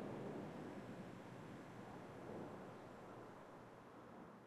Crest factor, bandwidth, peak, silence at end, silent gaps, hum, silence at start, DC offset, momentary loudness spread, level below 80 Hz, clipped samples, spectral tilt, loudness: 16 dB; 13 kHz; -38 dBFS; 0 s; none; none; 0 s; under 0.1%; 9 LU; -78 dBFS; under 0.1%; -7 dB/octave; -55 LUFS